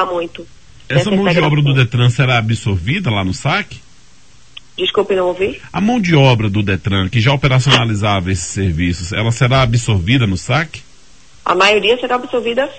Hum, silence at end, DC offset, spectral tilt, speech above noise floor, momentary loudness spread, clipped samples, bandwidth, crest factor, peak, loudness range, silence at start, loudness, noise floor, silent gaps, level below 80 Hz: none; 0 s; 0.9%; -5.5 dB/octave; 33 dB; 8 LU; under 0.1%; 9 kHz; 14 dB; 0 dBFS; 4 LU; 0 s; -14 LUFS; -47 dBFS; none; -36 dBFS